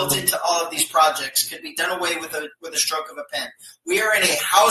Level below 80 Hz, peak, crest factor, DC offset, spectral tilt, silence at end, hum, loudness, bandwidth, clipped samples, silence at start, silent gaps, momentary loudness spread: -62 dBFS; -2 dBFS; 20 dB; under 0.1%; -1 dB/octave; 0 s; none; -20 LUFS; 13.5 kHz; under 0.1%; 0 s; none; 12 LU